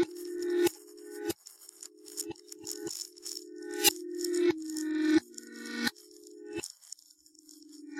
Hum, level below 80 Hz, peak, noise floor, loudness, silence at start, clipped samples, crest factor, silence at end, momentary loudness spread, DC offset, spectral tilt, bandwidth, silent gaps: none; -76 dBFS; -10 dBFS; -60 dBFS; -33 LUFS; 0 s; under 0.1%; 26 dB; 0 s; 21 LU; under 0.1%; -2 dB/octave; 16.5 kHz; none